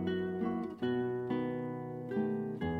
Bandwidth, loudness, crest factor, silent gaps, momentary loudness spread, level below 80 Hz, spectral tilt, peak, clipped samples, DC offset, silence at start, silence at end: 5.8 kHz; -36 LUFS; 12 dB; none; 4 LU; -62 dBFS; -9 dB/octave; -24 dBFS; under 0.1%; under 0.1%; 0 s; 0 s